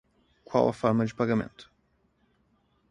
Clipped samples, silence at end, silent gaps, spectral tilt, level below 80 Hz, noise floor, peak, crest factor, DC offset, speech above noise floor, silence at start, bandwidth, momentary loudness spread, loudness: under 0.1%; 1.25 s; none; -7.5 dB/octave; -62 dBFS; -70 dBFS; -8 dBFS; 22 dB; under 0.1%; 44 dB; 0.5 s; 10.5 kHz; 5 LU; -27 LUFS